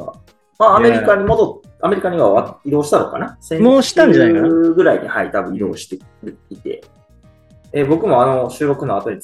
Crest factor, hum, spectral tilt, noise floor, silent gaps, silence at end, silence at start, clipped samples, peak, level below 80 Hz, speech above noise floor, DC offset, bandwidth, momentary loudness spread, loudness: 14 dB; none; -6 dB/octave; -48 dBFS; none; 0 s; 0 s; under 0.1%; 0 dBFS; -46 dBFS; 34 dB; under 0.1%; 12.5 kHz; 18 LU; -14 LUFS